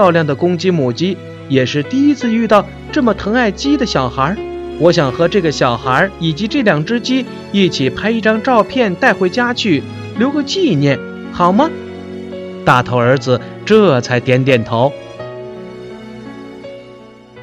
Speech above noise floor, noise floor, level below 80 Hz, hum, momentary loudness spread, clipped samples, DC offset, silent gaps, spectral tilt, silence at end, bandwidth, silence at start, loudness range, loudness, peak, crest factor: 24 dB; -37 dBFS; -42 dBFS; none; 16 LU; under 0.1%; under 0.1%; none; -6 dB/octave; 0 s; 10.5 kHz; 0 s; 2 LU; -14 LUFS; 0 dBFS; 14 dB